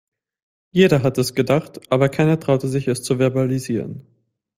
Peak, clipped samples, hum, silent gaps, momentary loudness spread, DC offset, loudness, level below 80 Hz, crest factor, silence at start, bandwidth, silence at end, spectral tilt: -2 dBFS; under 0.1%; none; none; 9 LU; under 0.1%; -19 LUFS; -54 dBFS; 18 dB; 0.75 s; 16 kHz; 0.55 s; -6.5 dB/octave